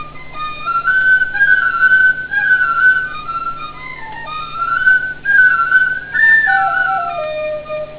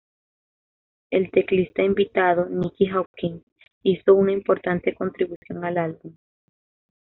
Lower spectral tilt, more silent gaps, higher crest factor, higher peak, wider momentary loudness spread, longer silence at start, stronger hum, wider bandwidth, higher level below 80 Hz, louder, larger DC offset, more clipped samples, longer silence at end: about the same, -5.5 dB/octave vs -5.5 dB/octave; second, none vs 3.06-3.14 s, 3.43-3.56 s, 3.72-3.81 s, 5.36-5.42 s; second, 14 dB vs 20 dB; first, 0 dBFS vs -4 dBFS; first, 16 LU vs 13 LU; second, 0 s vs 1.1 s; neither; about the same, 4 kHz vs 4.1 kHz; first, -46 dBFS vs -58 dBFS; first, -12 LUFS vs -22 LUFS; first, 0.6% vs under 0.1%; neither; second, 0 s vs 0.95 s